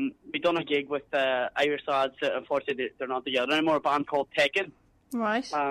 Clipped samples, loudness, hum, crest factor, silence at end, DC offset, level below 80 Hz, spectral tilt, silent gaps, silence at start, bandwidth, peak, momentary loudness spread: under 0.1%; -28 LUFS; none; 16 dB; 0 s; under 0.1%; -68 dBFS; -4 dB/octave; none; 0 s; 13.5 kHz; -12 dBFS; 7 LU